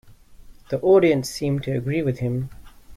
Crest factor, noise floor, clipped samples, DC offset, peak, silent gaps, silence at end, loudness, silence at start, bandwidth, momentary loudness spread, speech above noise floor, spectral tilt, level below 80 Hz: 16 dB; -45 dBFS; under 0.1%; under 0.1%; -6 dBFS; none; 0 s; -22 LUFS; 0.05 s; 15 kHz; 13 LU; 24 dB; -7 dB/octave; -48 dBFS